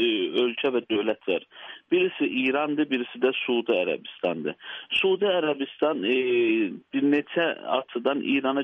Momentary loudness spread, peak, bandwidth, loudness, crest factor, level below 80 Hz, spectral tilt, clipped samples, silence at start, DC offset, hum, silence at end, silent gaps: 7 LU; -10 dBFS; 5.2 kHz; -25 LUFS; 16 dB; -74 dBFS; -6.5 dB/octave; under 0.1%; 0 s; under 0.1%; none; 0 s; none